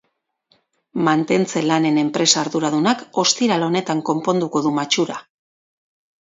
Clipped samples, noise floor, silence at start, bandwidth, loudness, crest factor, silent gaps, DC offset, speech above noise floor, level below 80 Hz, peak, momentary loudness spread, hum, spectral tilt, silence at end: under 0.1%; -65 dBFS; 0.95 s; 7.8 kHz; -18 LUFS; 18 dB; none; under 0.1%; 47 dB; -66 dBFS; -2 dBFS; 5 LU; none; -3.5 dB/octave; 1 s